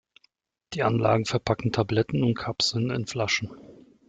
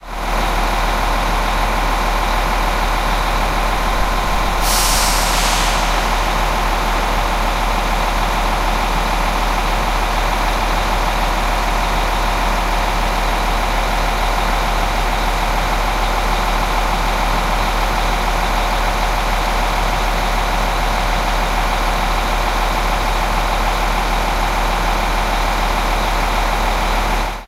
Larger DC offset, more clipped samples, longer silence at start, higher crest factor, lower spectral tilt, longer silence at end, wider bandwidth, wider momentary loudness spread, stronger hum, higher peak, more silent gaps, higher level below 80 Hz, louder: neither; neither; first, 0.7 s vs 0 s; about the same, 18 dB vs 14 dB; first, -5 dB/octave vs -3.5 dB/octave; first, 0.35 s vs 0 s; second, 9.2 kHz vs 16 kHz; first, 5 LU vs 1 LU; neither; second, -8 dBFS vs -2 dBFS; neither; second, -56 dBFS vs -20 dBFS; second, -25 LUFS vs -17 LUFS